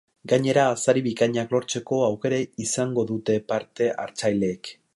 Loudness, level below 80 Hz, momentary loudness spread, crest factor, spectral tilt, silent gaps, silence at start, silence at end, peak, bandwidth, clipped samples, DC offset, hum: -24 LUFS; -64 dBFS; 6 LU; 18 dB; -5 dB/octave; none; 0.25 s; 0.25 s; -6 dBFS; 11.5 kHz; under 0.1%; under 0.1%; none